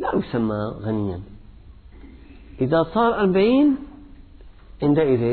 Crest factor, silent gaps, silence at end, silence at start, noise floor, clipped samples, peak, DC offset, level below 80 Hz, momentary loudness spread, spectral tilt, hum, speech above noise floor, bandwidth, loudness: 16 dB; none; 0 s; 0 s; -44 dBFS; under 0.1%; -6 dBFS; under 0.1%; -44 dBFS; 11 LU; -11.5 dB/octave; none; 24 dB; 4.5 kHz; -21 LUFS